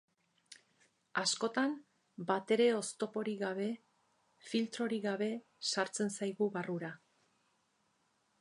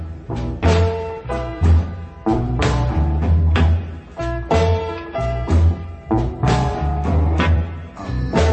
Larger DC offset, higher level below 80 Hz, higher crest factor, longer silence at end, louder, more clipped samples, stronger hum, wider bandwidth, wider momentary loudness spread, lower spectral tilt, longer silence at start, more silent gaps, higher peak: neither; second, -88 dBFS vs -26 dBFS; about the same, 20 dB vs 16 dB; first, 1.45 s vs 0 s; second, -36 LUFS vs -19 LUFS; neither; neither; first, 11 kHz vs 8.4 kHz; about the same, 10 LU vs 10 LU; second, -3.5 dB/octave vs -7.5 dB/octave; first, 0.5 s vs 0 s; neither; second, -18 dBFS vs -2 dBFS